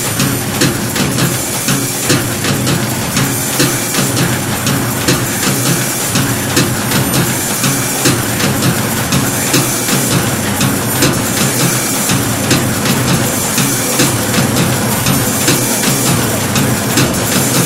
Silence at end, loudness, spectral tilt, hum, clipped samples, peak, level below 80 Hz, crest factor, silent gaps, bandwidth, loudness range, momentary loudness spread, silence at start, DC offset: 0 s; -12 LUFS; -3.5 dB/octave; none; under 0.1%; 0 dBFS; -36 dBFS; 14 dB; none; 16.5 kHz; 1 LU; 2 LU; 0 s; under 0.1%